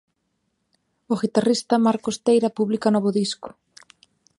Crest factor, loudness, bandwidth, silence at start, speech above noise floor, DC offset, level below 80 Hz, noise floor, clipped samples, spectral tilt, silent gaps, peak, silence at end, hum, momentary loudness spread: 18 dB; -21 LUFS; 11.5 kHz; 1.1 s; 53 dB; under 0.1%; -68 dBFS; -73 dBFS; under 0.1%; -5.5 dB/octave; none; -4 dBFS; 0.9 s; none; 8 LU